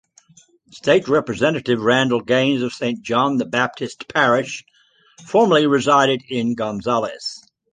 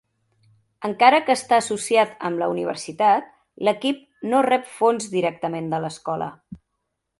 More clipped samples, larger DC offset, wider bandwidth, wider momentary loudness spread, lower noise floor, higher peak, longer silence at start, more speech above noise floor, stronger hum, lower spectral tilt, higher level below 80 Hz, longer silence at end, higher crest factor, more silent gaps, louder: neither; neither; second, 9.8 kHz vs 11.5 kHz; about the same, 11 LU vs 11 LU; second, -53 dBFS vs -78 dBFS; about the same, -2 dBFS vs 0 dBFS; about the same, 0.75 s vs 0.8 s; second, 35 dB vs 57 dB; neither; about the same, -5 dB/octave vs -4 dB/octave; first, -60 dBFS vs -66 dBFS; second, 0.35 s vs 0.65 s; about the same, 18 dB vs 22 dB; neither; first, -18 LUFS vs -21 LUFS